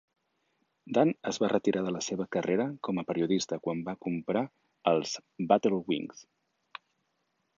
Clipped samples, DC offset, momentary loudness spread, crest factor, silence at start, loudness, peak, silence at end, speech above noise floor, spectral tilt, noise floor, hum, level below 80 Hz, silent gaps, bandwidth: under 0.1%; under 0.1%; 11 LU; 24 dB; 0.85 s; -30 LUFS; -8 dBFS; 1.35 s; 48 dB; -5.5 dB/octave; -78 dBFS; none; -72 dBFS; none; 7.6 kHz